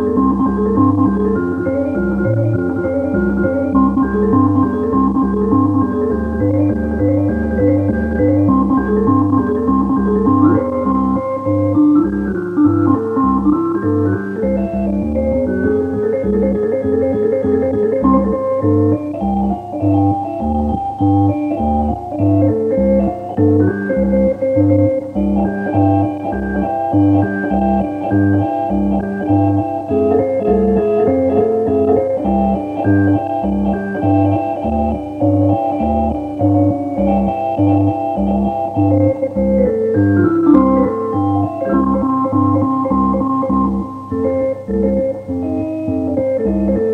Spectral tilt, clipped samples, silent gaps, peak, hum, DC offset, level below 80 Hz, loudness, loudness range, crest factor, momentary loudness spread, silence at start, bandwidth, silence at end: -11 dB/octave; under 0.1%; none; 0 dBFS; none; under 0.1%; -32 dBFS; -15 LUFS; 2 LU; 14 dB; 5 LU; 0 s; 3.6 kHz; 0 s